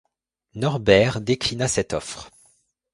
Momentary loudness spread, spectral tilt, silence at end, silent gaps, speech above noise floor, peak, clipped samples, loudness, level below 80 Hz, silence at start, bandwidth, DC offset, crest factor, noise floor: 18 LU; -4.5 dB/octave; 0.65 s; none; 41 dB; -2 dBFS; under 0.1%; -21 LUFS; -48 dBFS; 0.55 s; 11.5 kHz; under 0.1%; 22 dB; -62 dBFS